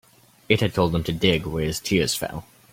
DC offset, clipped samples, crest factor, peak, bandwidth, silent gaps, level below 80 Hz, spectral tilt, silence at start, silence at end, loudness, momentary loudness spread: under 0.1%; under 0.1%; 22 dB; -2 dBFS; 16.5 kHz; none; -44 dBFS; -4.5 dB/octave; 0.5 s; 0.3 s; -23 LUFS; 6 LU